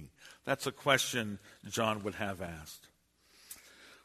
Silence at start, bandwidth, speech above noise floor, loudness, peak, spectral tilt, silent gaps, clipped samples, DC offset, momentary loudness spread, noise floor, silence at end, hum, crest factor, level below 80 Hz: 0 s; 13.5 kHz; 32 dB; -34 LUFS; -10 dBFS; -3 dB/octave; none; under 0.1%; under 0.1%; 22 LU; -67 dBFS; 0.1 s; none; 28 dB; -66 dBFS